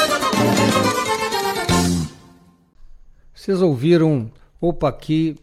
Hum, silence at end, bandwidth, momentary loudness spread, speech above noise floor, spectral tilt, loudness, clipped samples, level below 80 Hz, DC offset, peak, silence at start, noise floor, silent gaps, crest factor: none; 0.1 s; 16 kHz; 9 LU; 33 dB; -5 dB/octave; -19 LUFS; under 0.1%; -42 dBFS; under 0.1%; -4 dBFS; 0 s; -51 dBFS; none; 16 dB